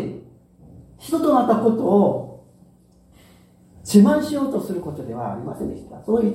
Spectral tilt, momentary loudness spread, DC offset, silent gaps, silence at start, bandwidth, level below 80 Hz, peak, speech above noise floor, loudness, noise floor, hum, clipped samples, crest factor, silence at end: -7 dB/octave; 19 LU; under 0.1%; none; 0 s; 15.5 kHz; -54 dBFS; -2 dBFS; 34 dB; -20 LUFS; -53 dBFS; none; under 0.1%; 20 dB; 0 s